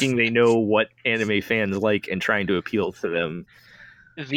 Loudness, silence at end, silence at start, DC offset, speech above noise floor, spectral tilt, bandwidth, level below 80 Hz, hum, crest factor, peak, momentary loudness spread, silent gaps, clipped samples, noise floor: -22 LUFS; 0 s; 0 s; under 0.1%; 27 dB; -5.5 dB/octave; 17 kHz; -58 dBFS; none; 16 dB; -6 dBFS; 10 LU; none; under 0.1%; -49 dBFS